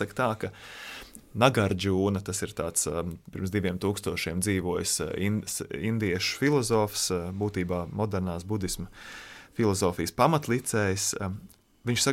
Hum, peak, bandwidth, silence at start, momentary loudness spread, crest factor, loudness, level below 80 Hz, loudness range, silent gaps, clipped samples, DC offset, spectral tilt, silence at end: none; -6 dBFS; 16.5 kHz; 0 s; 14 LU; 22 dB; -28 LUFS; -52 dBFS; 2 LU; none; under 0.1%; under 0.1%; -4.5 dB/octave; 0 s